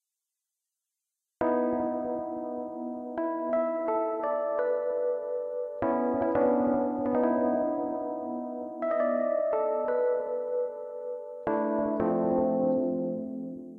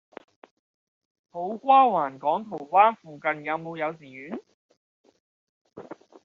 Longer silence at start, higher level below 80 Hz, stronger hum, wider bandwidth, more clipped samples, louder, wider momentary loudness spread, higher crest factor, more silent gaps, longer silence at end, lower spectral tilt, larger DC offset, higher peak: about the same, 1.4 s vs 1.35 s; first, -64 dBFS vs -80 dBFS; neither; second, 3.5 kHz vs 4.7 kHz; neither; second, -29 LUFS vs -24 LUFS; second, 9 LU vs 23 LU; second, 14 dB vs 20 dB; second, none vs 4.54-4.69 s, 4.77-5.04 s, 5.20-5.65 s; second, 0 s vs 0.3 s; first, -10.5 dB/octave vs -3 dB/octave; neither; second, -14 dBFS vs -6 dBFS